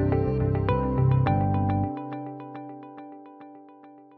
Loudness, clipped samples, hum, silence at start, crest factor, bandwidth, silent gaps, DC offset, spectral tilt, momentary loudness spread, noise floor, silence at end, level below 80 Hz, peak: -25 LUFS; under 0.1%; none; 0 s; 16 dB; 4.6 kHz; none; under 0.1%; -12 dB/octave; 22 LU; -50 dBFS; 0.15 s; -40 dBFS; -10 dBFS